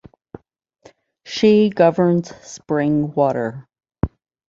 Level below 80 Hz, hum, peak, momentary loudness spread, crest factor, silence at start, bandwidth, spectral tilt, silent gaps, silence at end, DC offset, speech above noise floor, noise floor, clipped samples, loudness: -44 dBFS; none; -2 dBFS; 16 LU; 18 dB; 1.25 s; 7.8 kHz; -7 dB/octave; none; 0.45 s; under 0.1%; 31 dB; -48 dBFS; under 0.1%; -18 LUFS